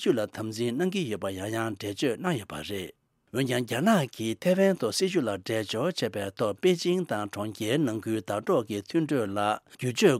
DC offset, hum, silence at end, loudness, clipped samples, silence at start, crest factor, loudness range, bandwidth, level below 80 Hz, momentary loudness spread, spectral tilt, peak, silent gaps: under 0.1%; none; 0 s; -28 LUFS; under 0.1%; 0 s; 18 dB; 4 LU; 16 kHz; -68 dBFS; 8 LU; -5 dB/octave; -8 dBFS; none